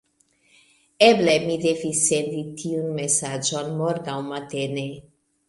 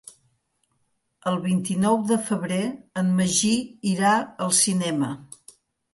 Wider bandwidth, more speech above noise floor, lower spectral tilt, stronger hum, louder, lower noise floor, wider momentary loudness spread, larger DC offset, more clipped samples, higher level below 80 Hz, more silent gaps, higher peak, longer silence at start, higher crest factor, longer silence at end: about the same, 11.5 kHz vs 12 kHz; second, 41 dB vs 49 dB; about the same, -3.5 dB/octave vs -4 dB/octave; neither; about the same, -22 LUFS vs -23 LUFS; second, -63 dBFS vs -72 dBFS; first, 13 LU vs 8 LU; neither; neither; about the same, -64 dBFS vs -64 dBFS; neither; first, -2 dBFS vs -6 dBFS; second, 1 s vs 1.25 s; about the same, 22 dB vs 18 dB; second, 0.45 s vs 0.7 s